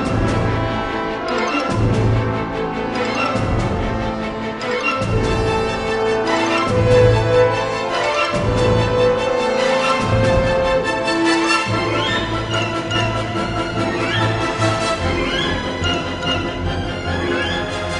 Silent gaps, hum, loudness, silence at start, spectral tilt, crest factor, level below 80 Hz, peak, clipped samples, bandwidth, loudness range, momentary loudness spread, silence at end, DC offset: none; none; -18 LUFS; 0 s; -5.5 dB/octave; 16 dB; -32 dBFS; -2 dBFS; under 0.1%; 10.5 kHz; 4 LU; 6 LU; 0 s; under 0.1%